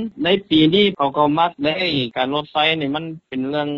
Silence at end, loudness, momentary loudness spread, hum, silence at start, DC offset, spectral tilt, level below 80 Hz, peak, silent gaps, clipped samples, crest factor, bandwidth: 0 s; -18 LUFS; 9 LU; none; 0 s; under 0.1%; -3 dB/octave; -52 dBFS; -2 dBFS; none; under 0.1%; 16 dB; 6.6 kHz